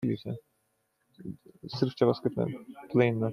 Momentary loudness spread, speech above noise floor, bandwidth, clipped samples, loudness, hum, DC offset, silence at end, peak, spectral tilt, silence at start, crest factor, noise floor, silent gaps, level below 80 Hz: 18 LU; 46 dB; 12.5 kHz; under 0.1%; -30 LUFS; none; under 0.1%; 0 s; -10 dBFS; -8.5 dB/octave; 0 s; 20 dB; -76 dBFS; none; -68 dBFS